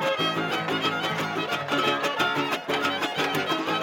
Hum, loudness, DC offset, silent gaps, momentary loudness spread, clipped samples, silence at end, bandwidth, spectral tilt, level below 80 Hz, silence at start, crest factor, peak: none; -25 LUFS; under 0.1%; none; 3 LU; under 0.1%; 0 s; 17 kHz; -4 dB/octave; -72 dBFS; 0 s; 16 dB; -10 dBFS